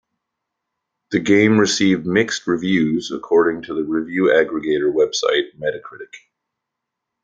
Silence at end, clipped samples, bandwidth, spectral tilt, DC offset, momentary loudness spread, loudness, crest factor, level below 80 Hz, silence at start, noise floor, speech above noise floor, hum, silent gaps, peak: 1.05 s; under 0.1%; 9.2 kHz; -4.5 dB/octave; under 0.1%; 11 LU; -18 LUFS; 18 dB; -60 dBFS; 1.1 s; -81 dBFS; 63 dB; none; none; 0 dBFS